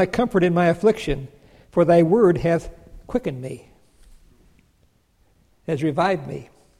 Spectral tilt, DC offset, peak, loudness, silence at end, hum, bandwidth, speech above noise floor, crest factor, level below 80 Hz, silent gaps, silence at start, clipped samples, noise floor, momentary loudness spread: -7.5 dB/octave; under 0.1%; -6 dBFS; -20 LUFS; 0.35 s; none; 12 kHz; 42 dB; 16 dB; -44 dBFS; none; 0 s; under 0.1%; -61 dBFS; 20 LU